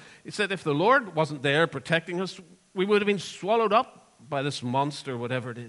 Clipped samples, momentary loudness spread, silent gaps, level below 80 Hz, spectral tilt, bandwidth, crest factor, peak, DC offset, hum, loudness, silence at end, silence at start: under 0.1%; 12 LU; none; -72 dBFS; -5 dB/octave; 11.5 kHz; 20 dB; -8 dBFS; under 0.1%; none; -26 LUFS; 0 s; 0 s